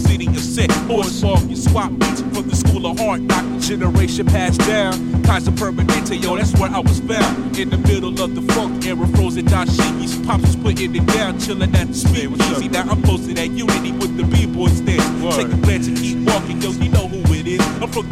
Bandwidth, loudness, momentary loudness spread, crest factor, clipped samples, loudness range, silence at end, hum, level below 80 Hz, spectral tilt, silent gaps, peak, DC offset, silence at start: 15 kHz; -17 LUFS; 4 LU; 16 dB; under 0.1%; 1 LU; 0 s; none; -26 dBFS; -5.5 dB/octave; none; 0 dBFS; under 0.1%; 0 s